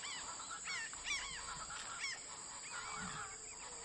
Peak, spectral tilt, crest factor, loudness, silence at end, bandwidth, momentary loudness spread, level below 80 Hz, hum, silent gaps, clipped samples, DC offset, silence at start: -28 dBFS; 0 dB/octave; 18 dB; -44 LUFS; 0 s; 11.5 kHz; 6 LU; -68 dBFS; none; none; under 0.1%; under 0.1%; 0 s